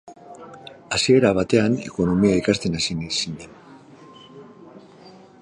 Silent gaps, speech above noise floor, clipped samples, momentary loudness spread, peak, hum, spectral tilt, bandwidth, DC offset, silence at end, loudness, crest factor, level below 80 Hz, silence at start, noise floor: none; 27 dB; under 0.1%; 24 LU; -4 dBFS; none; -5 dB/octave; 10.5 kHz; under 0.1%; 0.3 s; -20 LUFS; 20 dB; -48 dBFS; 0.05 s; -46 dBFS